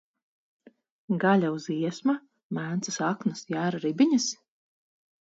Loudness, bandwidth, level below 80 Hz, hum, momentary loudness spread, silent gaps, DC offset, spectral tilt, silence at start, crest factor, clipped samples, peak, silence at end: -27 LUFS; 8 kHz; -76 dBFS; none; 10 LU; 2.43-2.50 s; under 0.1%; -5 dB/octave; 1.1 s; 18 dB; under 0.1%; -10 dBFS; 0.85 s